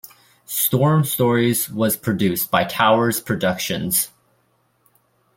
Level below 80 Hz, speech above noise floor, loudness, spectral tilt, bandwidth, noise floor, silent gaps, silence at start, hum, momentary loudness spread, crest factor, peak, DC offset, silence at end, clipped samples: -56 dBFS; 45 dB; -19 LUFS; -4.5 dB/octave; 17 kHz; -64 dBFS; none; 0.5 s; none; 5 LU; 20 dB; 0 dBFS; under 0.1%; 1.3 s; under 0.1%